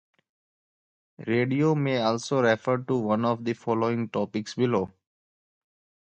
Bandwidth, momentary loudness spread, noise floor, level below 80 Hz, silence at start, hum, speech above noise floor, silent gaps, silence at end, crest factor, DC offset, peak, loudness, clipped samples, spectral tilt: 8.8 kHz; 6 LU; under -90 dBFS; -66 dBFS; 1.2 s; none; over 65 dB; none; 1.25 s; 20 dB; under 0.1%; -8 dBFS; -26 LUFS; under 0.1%; -6.5 dB/octave